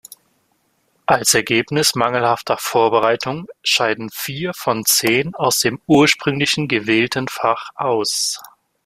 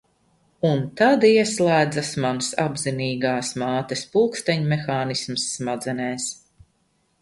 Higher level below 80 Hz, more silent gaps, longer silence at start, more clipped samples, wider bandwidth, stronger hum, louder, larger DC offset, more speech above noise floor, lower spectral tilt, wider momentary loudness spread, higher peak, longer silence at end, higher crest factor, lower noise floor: about the same, -56 dBFS vs -60 dBFS; neither; first, 1.1 s vs 0.65 s; neither; first, 16 kHz vs 11.5 kHz; neither; first, -17 LUFS vs -22 LUFS; neither; about the same, 46 dB vs 45 dB; second, -3 dB/octave vs -4.5 dB/octave; about the same, 9 LU vs 10 LU; first, 0 dBFS vs -4 dBFS; second, 0.4 s vs 0.9 s; about the same, 18 dB vs 18 dB; about the same, -64 dBFS vs -67 dBFS